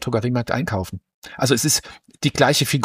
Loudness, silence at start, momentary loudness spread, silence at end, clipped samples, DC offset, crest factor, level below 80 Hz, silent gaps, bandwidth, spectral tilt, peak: -20 LUFS; 0 s; 14 LU; 0 s; under 0.1%; under 0.1%; 20 dB; -50 dBFS; 1.14-1.22 s; 15.5 kHz; -4 dB/octave; -2 dBFS